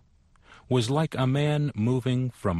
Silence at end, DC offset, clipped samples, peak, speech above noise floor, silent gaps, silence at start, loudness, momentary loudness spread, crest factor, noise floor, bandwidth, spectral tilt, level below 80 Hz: 0 s; under 0.1%; under 0.1%; -12 dBFS; 34 dB; none; 0.5 s; -26 LUFS; 3 LU; 14 dB; -59 dBFS; 12 kHz; -7 dB/octave; -56 dBFS